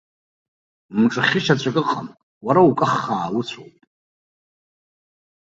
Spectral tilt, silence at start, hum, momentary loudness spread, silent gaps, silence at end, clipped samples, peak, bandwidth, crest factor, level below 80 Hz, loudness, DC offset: -6 dB/octave; 0.9 s; none; 16 LU; 2.23-2.41 s; 1.9 s; under 0.1%; -2 dBFS; 7.8 kHz; 20 dB; -62 dBFS; -19 LUFS; under 0.1%